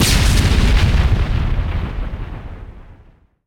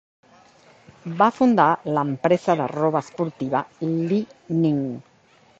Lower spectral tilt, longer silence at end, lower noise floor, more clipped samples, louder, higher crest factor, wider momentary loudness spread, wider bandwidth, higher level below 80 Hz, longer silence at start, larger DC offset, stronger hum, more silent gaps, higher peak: second, -4.5 dB/octave vs -8 dB/octave; about the same, 0.55 s vs 0.6 s; second, -48 dBFS vs -56 dBFS; neither; first, -17 LUFS vs -22 LUFS; second, 14 dB vs 20 dB; first, 18 LU vs 11 LU; first, 18 kHz vs 8 kHz; first, -18 dBFS vs -66 dBFS; second, 0 s vs 1.05 s; neither; neither; neither; about the same, -2 dBFS vs -2 dBFS